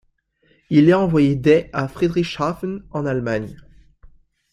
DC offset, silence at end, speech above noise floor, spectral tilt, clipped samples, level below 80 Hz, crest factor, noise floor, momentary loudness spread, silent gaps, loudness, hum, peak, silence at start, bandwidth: under 0.1%; 1 s; 44 dB; -8 dB/octave; under 0.1%; -48 dBFS; 18 dB; -62 dBFS; 12 LU; none; -19 LUFS; none; -2 dBFS; 0.7 s; 10.5 kHz